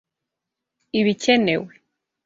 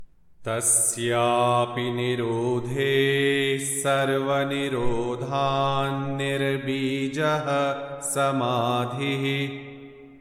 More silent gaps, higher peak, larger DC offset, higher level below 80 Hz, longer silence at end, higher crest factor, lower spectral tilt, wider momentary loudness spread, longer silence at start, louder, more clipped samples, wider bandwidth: neither; first, -4 dBFS vs -10 dBFS; neither; second, -64 dBFS vs -50 dBFS; first, 0.55 s vs 0 s; about the same, 20 dB vs 16 dB; about the same, -4.5 dB/octave vs -4 dB/octave; about the same, 9 LU vs 7 LU; first, 0.95 s vs 0 s; first, -20 LUFS vs -24 LUFS; neither; second, 7.8 kHz vs 18 kHz